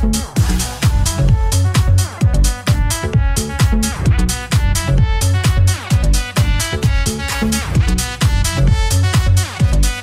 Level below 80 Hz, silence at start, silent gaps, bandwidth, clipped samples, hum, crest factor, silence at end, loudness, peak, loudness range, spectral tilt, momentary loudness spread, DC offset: -18 dBFS; 0 s; none; 16 kHz; under 0.1%; none; 12 dB; 0 s; -16 LUFS; -2 dBFS; 1 LU; -4.5 dB/octave; 3 LU; under 0.1%